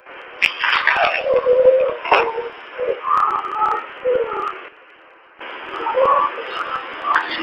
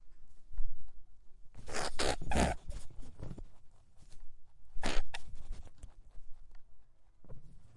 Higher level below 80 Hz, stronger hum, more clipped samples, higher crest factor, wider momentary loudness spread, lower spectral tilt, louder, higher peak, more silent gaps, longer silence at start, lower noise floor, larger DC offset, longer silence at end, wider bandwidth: second, -58 dBFS vs -42 dBFS; neither; neither; about the same, 20 dB vs 18 dB; second, 14 LU vs 28 LU; about the same, -3 dB/octave vs -4 dB/octave; first, -18 LUFS vs -40 LUFS; first, 0 dBFS vs -14 dBFS; neither; about the same, 0.05 s vs 0 s; second, -47 dBFS vs -51 dBFS; neither; about the same, 0 s vs 0.05 s; second, 8.4 kHz vs 11.5 kHz